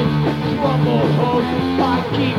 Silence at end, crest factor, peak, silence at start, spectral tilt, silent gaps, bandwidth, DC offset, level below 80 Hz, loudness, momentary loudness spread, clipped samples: 0 s; 12 dB; -4 dBFS; 0 s; -8 dB/octave; none; 12 kHz; under 0.1%; -40 dBFS; -17 LUFS; 3 LU; under 0.1%